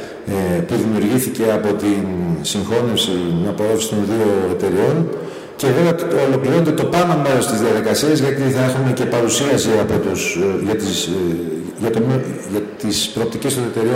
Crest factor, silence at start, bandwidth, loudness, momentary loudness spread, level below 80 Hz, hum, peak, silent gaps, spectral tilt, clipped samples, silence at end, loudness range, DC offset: 14 dB; 0 s; 16 kHz; -17 LUFS; 6 LU; -52 dBFS; none; -2 dBFS; none; -5 dB/octave; under 0.1%; 0 s; 3 LU; under 0.1%